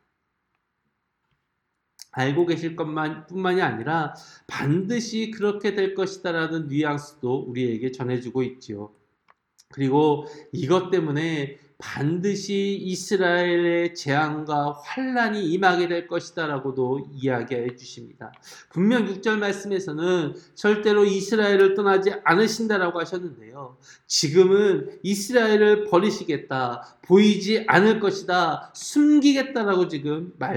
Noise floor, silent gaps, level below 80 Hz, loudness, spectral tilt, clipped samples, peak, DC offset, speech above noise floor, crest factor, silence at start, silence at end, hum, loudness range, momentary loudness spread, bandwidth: -77 dBFS; none; -70 dBFS; -23 LUFS; -5 dB/octave; under 0.1%; -2 dBFS; under 0.1%; 54 dB; 22 dB; 2.15 s; 0 s; none; 7 LU; 13 LU; 17.5 kHz